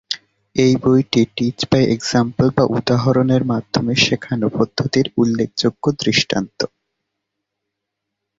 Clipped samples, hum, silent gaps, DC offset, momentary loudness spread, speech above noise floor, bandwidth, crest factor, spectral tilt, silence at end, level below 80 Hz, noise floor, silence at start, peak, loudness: under 0.1%; none; none; under 0.1%; 6 LU; 62 dB; 7.8 kHz; 16 dB; -5.5 dB/octave; 1.7 s; -48 dBFS; -79 dBFS; 0.1 s; -2 dBFS; -17 LUFS